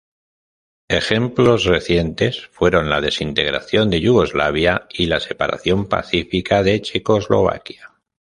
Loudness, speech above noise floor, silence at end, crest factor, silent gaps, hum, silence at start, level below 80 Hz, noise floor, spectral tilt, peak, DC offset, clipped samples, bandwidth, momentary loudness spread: -17 LUFS; over 73 dB; 0.5 s; 16 dB; none; none; 0.9 s; -38 dBFS; under -90 dBFS; -5.5 dB/octave; -2 dBFS; under 0.1%; under 0.1%; 11 kHz; 5 LU